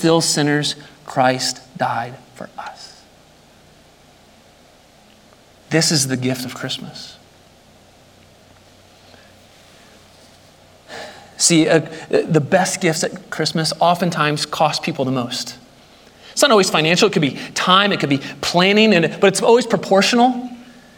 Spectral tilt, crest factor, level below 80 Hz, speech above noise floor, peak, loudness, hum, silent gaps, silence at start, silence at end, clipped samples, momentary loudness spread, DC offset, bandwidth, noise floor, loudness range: -3.5 dB/octave; 18 dB; -60 dBFS; 32 dB; 0 dBFS; -16 LUFS; none; none; 0 s; 0.3 s; under 0.1%; 20 LU; under 0.1%; 17 kHz; -49 dBFS; 12 LU